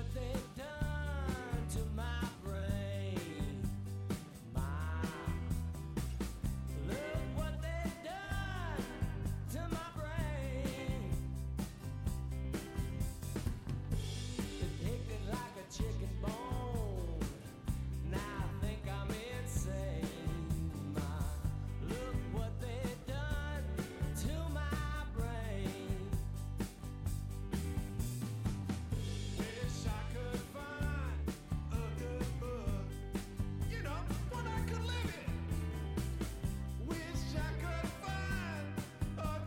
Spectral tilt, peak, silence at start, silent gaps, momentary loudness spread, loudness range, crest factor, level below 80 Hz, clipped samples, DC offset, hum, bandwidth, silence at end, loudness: -6 dB/octave; -24 dBFS; 0 s; none; 3 LU; 1 LU; 14 dB; -44 dBFS; under 0.1%; under 0.1%; none; 16.5 kHz; 0 s; -41 LUFS